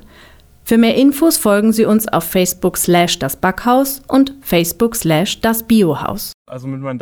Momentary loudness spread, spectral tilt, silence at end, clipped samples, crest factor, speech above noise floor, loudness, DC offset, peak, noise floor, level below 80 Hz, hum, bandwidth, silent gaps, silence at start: 12 LU; -4.5 dB/octave; 0 s; under 0.1%; 12 dB; 30 dB; -14 LUFS; under 0.1%; -2 dBFS; -44 dBFS; -42 dBFS; none; over 20 kHz; 6.34-6.45 s; 0.65 s